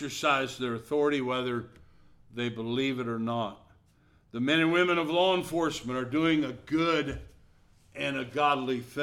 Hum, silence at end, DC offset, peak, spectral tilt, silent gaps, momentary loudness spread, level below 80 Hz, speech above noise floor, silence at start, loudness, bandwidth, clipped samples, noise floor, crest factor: none; 0 s; under 0.1%; -12 dBFS; -5 dB/octave; none; 11 LU; -58 dBFS; 34 dB; 0 s; -29 LUFS; 15.5 kHz; under 0.1%; -63 dBFS; 18 dB